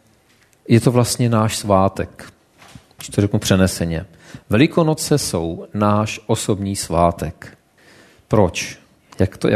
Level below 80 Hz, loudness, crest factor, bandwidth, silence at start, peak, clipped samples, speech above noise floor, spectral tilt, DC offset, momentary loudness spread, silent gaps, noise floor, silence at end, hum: -42 dBFS; -18 LUFS; 18 dB; 13.5 kHz; 0.7 s; 0 dBFS; under 0.1%; 38 dB; -5.5 dB/octave; under 0.1%; 13 LU; none; -55 dBFS; 0 s; none